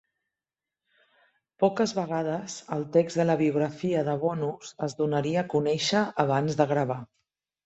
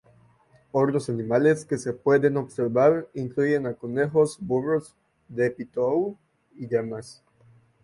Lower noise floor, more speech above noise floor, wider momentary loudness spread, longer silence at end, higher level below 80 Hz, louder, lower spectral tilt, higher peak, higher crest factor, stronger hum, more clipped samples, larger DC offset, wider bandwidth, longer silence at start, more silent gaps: first, under -90 dBFS vs -59 dBFS; first, over 64 dB vs 35 dB; about the same, 9 LU vs 9 LU; about the same, 0.6 s vs 0.7 s; about the same, -68 dBFS vs -64 dBFS; about the same, -27 LUFS vs -25 LUFS; second, -5.5 dB/octave vs -7 dB/octave; about the same, -8 dBFS vs -8 dBFS; about the same, 20 dB vs 18 dB; neither; neither; neither; second, 8.2 kHz vs 11.5 kHz; first, 1.6 s vs 0.75 s; neither